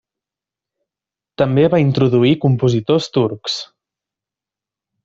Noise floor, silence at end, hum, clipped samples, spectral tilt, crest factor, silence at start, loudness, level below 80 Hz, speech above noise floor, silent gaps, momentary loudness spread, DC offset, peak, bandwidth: -88 dBFS; 1.4 s; none; under 0.1%; -7 dB/octave; 16 dB; 1.4 s; -16 LUFS; -52 dBFS; 73 dB; none; 10 LU; under 0.1%; -2 dBFS; 7.8 kHz